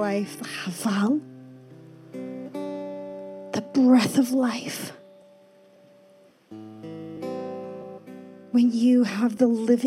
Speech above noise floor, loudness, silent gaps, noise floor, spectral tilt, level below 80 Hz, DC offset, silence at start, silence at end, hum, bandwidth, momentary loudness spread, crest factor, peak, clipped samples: 34 dB; -24 LUFS; none; -56 dBFS; -5.5 dB/octave; -80 dBFS; under 0.1%; 0 s; 0 s; none; 15 kHz; 23 LU; 18 dB; -8 dBFS; under 0.1%